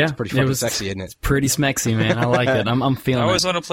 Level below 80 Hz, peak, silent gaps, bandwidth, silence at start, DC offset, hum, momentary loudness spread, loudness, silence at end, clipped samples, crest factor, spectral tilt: -38 dBFS; -4 dBFS; none; 16.5 kHz; 0 s; under 0.1%; none; 5 LU; -19 LUFS; 0 s; under 0.1%; 14 dB; -4.5 dB/octave